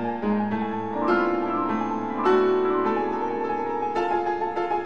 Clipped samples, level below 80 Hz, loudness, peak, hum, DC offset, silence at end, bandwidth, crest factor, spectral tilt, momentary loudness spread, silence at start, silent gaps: under 0.1%; -60 dBFS; -24 LUFS; -10 dBFS; none; 0.7%; 0 s; 6.8 kHz; 16 dB; -7.5 dB/octave; 6 LU; 0 s; none